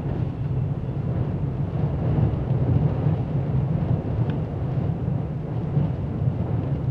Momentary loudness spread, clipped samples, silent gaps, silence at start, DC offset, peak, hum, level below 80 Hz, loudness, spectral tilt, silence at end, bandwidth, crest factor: 5 LU; under 0.1%; none; 0 s; under 0.1%; -8 dBFS; none; -38 dBFS; -25 LUFS; -11 dB/octave; 0 s; 4.5 kHz; 14 dB